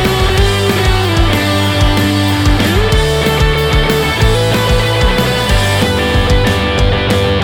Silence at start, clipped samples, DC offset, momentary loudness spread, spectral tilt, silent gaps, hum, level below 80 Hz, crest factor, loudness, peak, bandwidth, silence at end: 0 s; under 0.1%; under 0.1%; 1 LU; -5 dB/octave; none; none; -18 dBFS; 10 dB; -12 LUFS; 0 dBFS; 19 kHz; 0 s